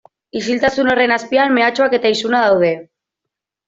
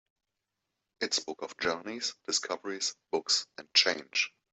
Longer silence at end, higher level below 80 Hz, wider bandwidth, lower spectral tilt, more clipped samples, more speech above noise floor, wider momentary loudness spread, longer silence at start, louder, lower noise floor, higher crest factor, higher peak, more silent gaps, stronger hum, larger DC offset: first, 0.85 s vs 0.25 s; first, -54 dBFS vs -76 dBFS; about the same, 7.8 kHz vs 8.4 kHz; first, -4.5 dB/octave vs 0 dB/octave; neither; first, 67 dB vs 53 dB; about the same, 8 LU vs 10 LU; second, 0.35 s vs 1 s; first, -15 LUFS vs -30 LUFS; second, -82 dBFS vs -86 dBFS; second, 14 dB vs 24 dB; first, -2 dBFS vs -10 dBFS; neither; neither; neither